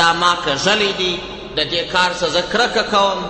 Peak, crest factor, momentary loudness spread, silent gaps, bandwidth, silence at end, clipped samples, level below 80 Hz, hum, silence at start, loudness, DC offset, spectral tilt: -2 dBFS; 14 dB; 5 LU; none; 8.8 kHz; 0 s; under 0.1%; -44 dBFS; none; 0 s; -16 LUFS; under 0.1%; -2.5 dB/octave